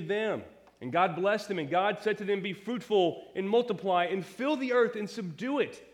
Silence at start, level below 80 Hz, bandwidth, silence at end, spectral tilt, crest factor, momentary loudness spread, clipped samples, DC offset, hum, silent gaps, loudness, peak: 0 s; -76 dBFS; 14 kHz; 0.1 s; -6 dB/octave; 18 dB; 9 LU; under 0.1%; under 0.1%; none; none; -30 LUFS; -12 dBFS